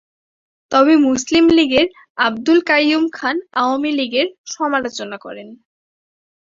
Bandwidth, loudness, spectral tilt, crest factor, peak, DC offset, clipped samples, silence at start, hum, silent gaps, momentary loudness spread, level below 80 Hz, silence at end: 7.6 kHz; -16 LUFS; -3 dB/octave; 16 dB; 0 dBFS; under 0.1%; under 0.1%; 0.7 s; none; 2.10-2.15 s, 4.38-4.44 s; 14 LU; -54 dBFS; 1 s